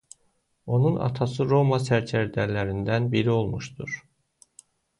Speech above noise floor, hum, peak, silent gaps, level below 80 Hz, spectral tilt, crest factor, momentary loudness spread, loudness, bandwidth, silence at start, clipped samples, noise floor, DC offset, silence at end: 46 dB; none; -10 dBFS; none; -52 dBFS; -7 dB/octave; 16 dB; 12 LU; -25 LUFS; 11 kHz; 0.65 s; under 0.1%; -69 dBFS; under 0.1%; 1 s